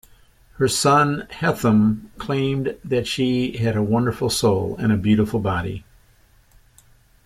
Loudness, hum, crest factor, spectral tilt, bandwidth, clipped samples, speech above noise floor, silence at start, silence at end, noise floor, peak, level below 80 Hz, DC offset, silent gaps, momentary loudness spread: -20 LUFS; none; 18 dB; -5.5 dB/octave; 15.5 kHz; under 0.1%; 35 dB; 0.6 s; 1.45 s; -55 dBFS; -4 dBFS; -46 dBFS; under 0.1%; none; 8 LU